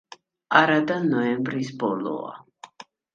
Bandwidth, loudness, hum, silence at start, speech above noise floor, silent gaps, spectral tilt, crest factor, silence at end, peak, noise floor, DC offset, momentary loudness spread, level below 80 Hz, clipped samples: 7.4 kHz; -23 LUFS; none; 0.5 s; 26 dB; none; -6 dB/octave; 24 dB; 0.3 s; -2 dBFS; -48 dBFS; under 0.1%; 15 LU; -70 dBFS; under 0.1%